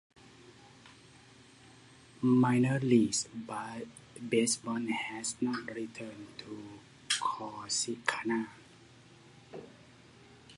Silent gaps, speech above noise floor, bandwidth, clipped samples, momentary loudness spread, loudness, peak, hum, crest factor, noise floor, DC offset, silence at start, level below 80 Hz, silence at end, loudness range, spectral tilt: none; 25 dB; 11.5 kHz; under 0.1%; 20 LU; -32 LUFS; -10 dBFS; none; 24 dB; -58 dBFS; under 0.1%; 0.4 s; -72 dBFS; 0 s; 5 LU; -4 dB/octave